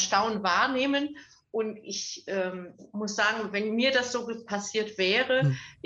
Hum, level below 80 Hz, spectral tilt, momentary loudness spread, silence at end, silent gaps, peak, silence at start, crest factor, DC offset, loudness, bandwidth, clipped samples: none; -68 dBFS; -3.5 dB/octave; 11 LU; 0.15 s; none; -10 dBFS; 0 s; 18 dB; under 0.1%; -28 LUFS; 8.2 kHz; under 0.1%